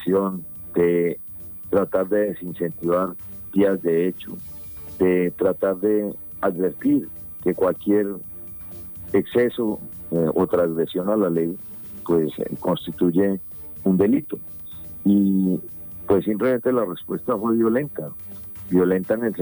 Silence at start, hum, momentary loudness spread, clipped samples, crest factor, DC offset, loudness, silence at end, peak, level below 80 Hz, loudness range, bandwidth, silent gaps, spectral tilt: 0 s; none; 13 LU; under 0.1%; 16 dB; under 0.1%; -22 LUFS; 0 s; -6 dBFS; -54 dBFS; 2 LU; over 20 kHz; none; -9 dB/octave